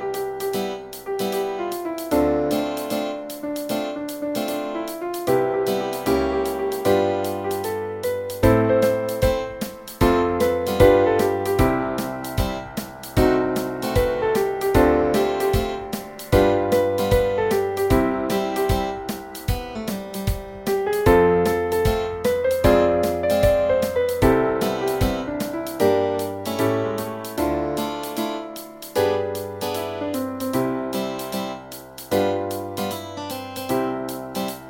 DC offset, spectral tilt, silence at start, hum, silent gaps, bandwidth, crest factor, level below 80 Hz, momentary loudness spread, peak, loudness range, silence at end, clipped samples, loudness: under 0.1%; -6 dB/octave; 0 s; none; none; 17 kHz; 20 dB; -36 dBFS; 11 LU; -2 dBFS; 6 LU; 0 s; under 0.1%; -22 LUFS